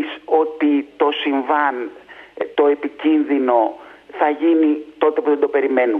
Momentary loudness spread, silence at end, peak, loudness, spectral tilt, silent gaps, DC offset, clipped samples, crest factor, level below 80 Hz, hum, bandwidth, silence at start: 8 LU; 0 s; 0 dBFS; -18 LUFS; -6 dB/octave; none; under 0.1%; under 0.1%; 18 dB; -68 dBFS; none; 4 kHz; 0 s